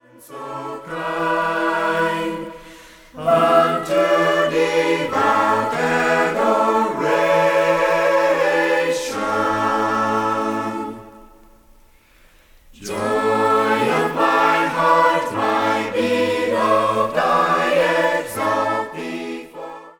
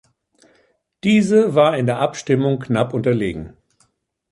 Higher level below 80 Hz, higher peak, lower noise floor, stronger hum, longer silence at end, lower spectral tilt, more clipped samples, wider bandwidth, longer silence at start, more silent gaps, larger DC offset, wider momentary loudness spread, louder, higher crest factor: about the same, -54 dBFS vs -50 dBFS; about the same, -2 dBFS vs -2 dBFS; second, -51 dBFS vs -65 dBFS; neither; second, 0.1 s vs 0.85 s; second, -4.5 dB/octave vs -6.5 dB/octave; neither; first, 19 kHz vs 11.5 kHz; second, 0.2 s vs 1.05 s; neither; neither; first, 13 LU vs 10 LU; about the same, -18 LUFS vs -18 LUFS; about the same, 18 dB vs 16 dB